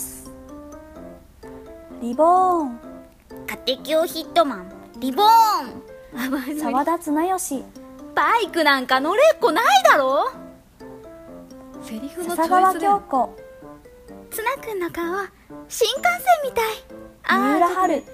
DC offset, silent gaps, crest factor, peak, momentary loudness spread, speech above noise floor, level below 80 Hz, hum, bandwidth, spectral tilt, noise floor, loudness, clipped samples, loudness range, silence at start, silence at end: under 0.1%; none; 20 dB; -2 dBFS; 25 LU; 23 dB; -54 dBFS; none; 15.5 kHz; -2.5 dB/octave; -43 dBFS; -20 LUFS; under 0.1%; 6 LU; 0 s; 0 s